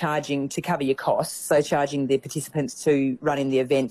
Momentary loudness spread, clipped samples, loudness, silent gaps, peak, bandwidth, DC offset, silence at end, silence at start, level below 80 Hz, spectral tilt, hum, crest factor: 5 LU; under 0.1%; -24 LUFS; none; -10 dBFS; 14.5 kHz; under 0.1%; 0 s; 0 s; -62 dBFS; -5 dB/octave; none; 14 dB